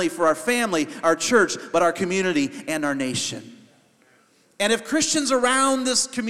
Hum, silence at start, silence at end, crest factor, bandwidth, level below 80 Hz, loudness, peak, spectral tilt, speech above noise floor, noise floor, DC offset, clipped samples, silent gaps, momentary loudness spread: none; 0 s; 0 s; 18 dB; 15.5 kHz; -64 dBFS; -21 LUFS; -4 dBFS; -2.5 dB/octave; 37 dB; -59 dBFS; 0.2%; under 0.1%; none; 7 LU